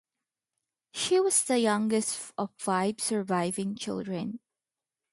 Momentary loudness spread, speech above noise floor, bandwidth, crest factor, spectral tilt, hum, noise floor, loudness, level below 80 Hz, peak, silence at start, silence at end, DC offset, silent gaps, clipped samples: 12 LU; over 62 dB; 12 kHz; 18 dB; -3.5 dB/octave; none; under -90 dBFS; -28 LUFS; -74 dBFS; -12 dBFS; 0.95 s; 0.75 s; under 0.1%; none; under 0.1%